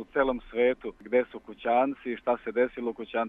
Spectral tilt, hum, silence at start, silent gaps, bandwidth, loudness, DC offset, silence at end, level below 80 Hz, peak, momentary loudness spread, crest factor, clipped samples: -7.5 dB/octave; none; 0 s; none; 3.9 kHz; -29 LUFS; under 0.1%; 0 s; -56 dBFS; -12 dBFS; 9 LU; 18 dB; under 0.1%